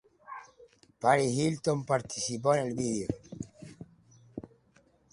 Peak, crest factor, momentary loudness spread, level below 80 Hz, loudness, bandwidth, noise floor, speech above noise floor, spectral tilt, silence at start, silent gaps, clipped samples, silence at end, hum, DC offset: -10 dBFS; 22 dB; 21 LU; -62 dBFS; -30 LUFS; 11.5 kHz; -65 dBFS; 37 dB; -5 dB/octave; 0.3 s; none; under 0.1%; 0.65 s; none; under 0.1%